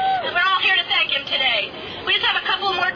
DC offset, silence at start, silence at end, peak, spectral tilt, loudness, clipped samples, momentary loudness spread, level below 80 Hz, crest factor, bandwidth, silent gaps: under 0.1%; 0 s; 0 s; -8 dBFS; -3 dB/octave; -18 LUFS; under 0.1%; 5 LU; -56 dBFS; 12 dB; 5.4 kHz; none